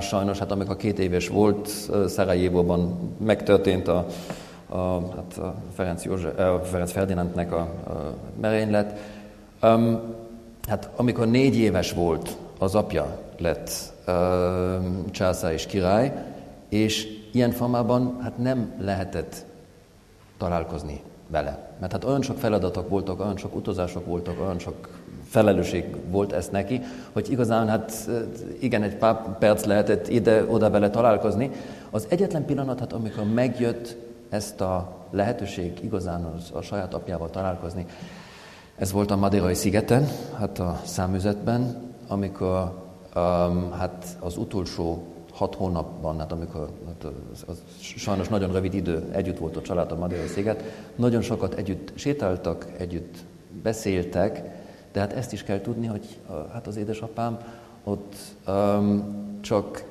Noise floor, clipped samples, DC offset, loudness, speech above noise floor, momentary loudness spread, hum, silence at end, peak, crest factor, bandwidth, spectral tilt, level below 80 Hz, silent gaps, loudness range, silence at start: -52 dBFS; under 0.1%; under 0.1%; -26 LUFS; 27 dB; 15 LU; none; 0 s; -4 dBFS; 22 dB; 14.5 kHz; -6.5 dB/octave; -44 dBFS; none; 7 LU; 0 s